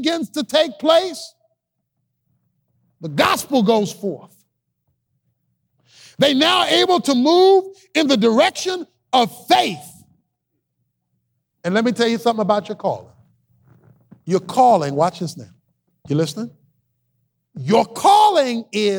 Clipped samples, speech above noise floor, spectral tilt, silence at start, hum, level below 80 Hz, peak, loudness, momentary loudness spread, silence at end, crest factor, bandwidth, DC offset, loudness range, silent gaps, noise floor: under 0.1%; 58 dB; -4.5 dB/octave; 0 s; none; -66 dBFS; -2 dBFS; -17 LUFS; 16 LU; 0 s; 16 dB; 19.5 kHz; under 0.1%; 7 LU; none; -75 dBFS